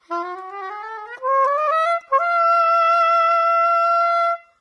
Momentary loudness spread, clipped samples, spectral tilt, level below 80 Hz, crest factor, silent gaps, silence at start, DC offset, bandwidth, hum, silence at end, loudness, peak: 15 LU; under 0.1%; -1 dB/octave; -82 dBFS; 12 dB; none; 0.1 s; under 0.1%; 10 kHz; none; 0.2 s; -17 LUFS; -6 dBFS